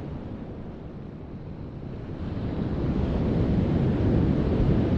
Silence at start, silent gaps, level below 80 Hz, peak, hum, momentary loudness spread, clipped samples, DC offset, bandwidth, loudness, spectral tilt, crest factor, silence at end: 0 s; none; -34 dBFS; -10 dBFS; none; 16 LU; under 0.1%; under 0.1%; 6.6 kHz; -26 LUFS; -10 dB/octave; 16 dB; 0 s